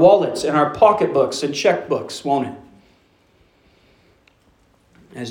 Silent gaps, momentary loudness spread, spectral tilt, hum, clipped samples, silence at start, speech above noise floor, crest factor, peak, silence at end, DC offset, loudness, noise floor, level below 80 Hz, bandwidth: none; 17 LU; -5 dB/octave; none; under 0.1%; 0 s; 40 dB; 18 dB; -2 dBFS; 0 s; under 0.1%; -18 LUFS; -57 dBFS; -58 dBFS; 17 kHz